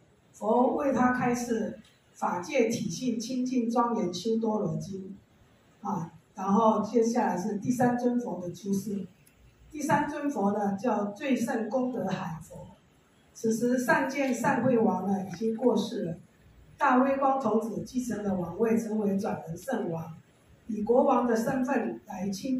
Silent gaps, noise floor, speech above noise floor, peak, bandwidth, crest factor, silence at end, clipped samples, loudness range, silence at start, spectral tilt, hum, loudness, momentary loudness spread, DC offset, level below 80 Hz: none; -62 dBFS; 34 dB; -10 dBFS; 15 kHz; 20 dB; 0 s; under 0.1%; 3 LU; 0.35 s; -6 dB/octave; none; -29 LUFS; 12 LU; under 0.1%; -66 dBFS